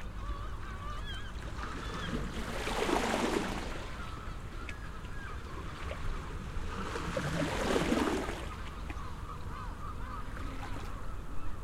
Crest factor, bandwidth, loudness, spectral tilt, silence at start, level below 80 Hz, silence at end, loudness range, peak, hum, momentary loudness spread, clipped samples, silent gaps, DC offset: 20 dB; 16 kHz; -38 LUFS; -5 dB/octave; 0 s; -42 dBFS; 0 s; 7 LU; -16 dBFS; none; 12 LU; under 0.1%; none; under 0.1%